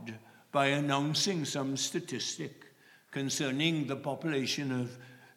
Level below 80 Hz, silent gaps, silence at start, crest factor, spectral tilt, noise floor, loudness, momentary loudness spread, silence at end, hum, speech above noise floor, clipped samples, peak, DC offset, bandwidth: -84 dBFS; none; 0 s; 20 dB; -4 dB/octave; -59 dBFS; -32 LUFS; 13 LU; 0.1 s; none; 26 dB; under 0.1%; -14 dBFS; under 0.1%; 16.5 kHz